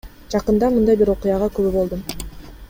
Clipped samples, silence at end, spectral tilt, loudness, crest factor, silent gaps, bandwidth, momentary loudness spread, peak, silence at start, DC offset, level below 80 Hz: under 0.1%; 0.05 s; -7 dB/octave; -19 LUFS; 14 dB; none; 16.5 kHz; 14 LU; -4 dBFS; 0.05 s; under 0.1%; -36 dBFS